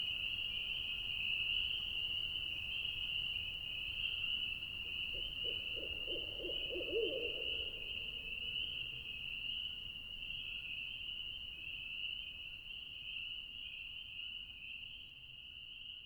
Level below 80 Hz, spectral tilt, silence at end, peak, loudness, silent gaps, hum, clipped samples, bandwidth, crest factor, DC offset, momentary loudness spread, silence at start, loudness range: -60 dBFS; -3.5 dB/octave; 0 s; -26 dBFS; -40 LUFS; none; none; under 0.1%; 19 kHz; 18 dB; under 0.1%; 9 LU; 0 s; 7 LU